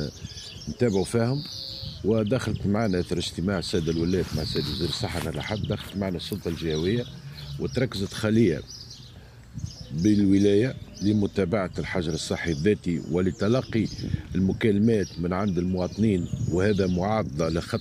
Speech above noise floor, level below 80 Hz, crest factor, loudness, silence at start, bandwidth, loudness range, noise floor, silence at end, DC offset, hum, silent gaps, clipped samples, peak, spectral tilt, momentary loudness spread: 21 dB; -46 dBFS; 16 dB; -26 LUFS; 0 s; 15.5 kHz; 4 LU; -46 dBFS; 0 s; under 0.1%; none; none; under 0.1%; -8 dBFS; -6.5 dB/octave; 12 LU